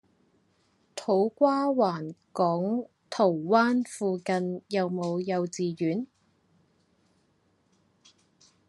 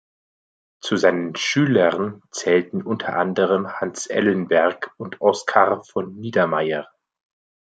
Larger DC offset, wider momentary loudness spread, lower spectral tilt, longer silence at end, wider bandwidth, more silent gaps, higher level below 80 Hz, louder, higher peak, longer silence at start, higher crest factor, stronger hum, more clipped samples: neither; first, 13 LU vs 10 LU; first, -6.5 dB/octave vs -5 dB/octave; first, 2.65 s vs 0.9 s; first, 12 kHz vs 9.2 kHz; neither; second, -80 dBFS vs -68 dBFS; second, -28 LUFS vs -21 LUFS; second, -8 dBFS vs -2 dBFS; about the same, 0.95 s vs 0.85 s; about the same, 20 dB vs 20 dB; neither; neither